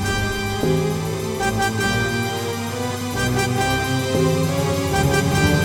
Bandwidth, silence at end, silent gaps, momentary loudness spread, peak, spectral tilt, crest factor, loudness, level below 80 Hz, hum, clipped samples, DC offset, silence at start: over 20 kHz; 0 s; none; 6 LU; -6 dBFS; -5 dB/octave; 16 dB; -21 LUFS; -36 dBFS; none; under 0.1%; under 0.1%; 0 s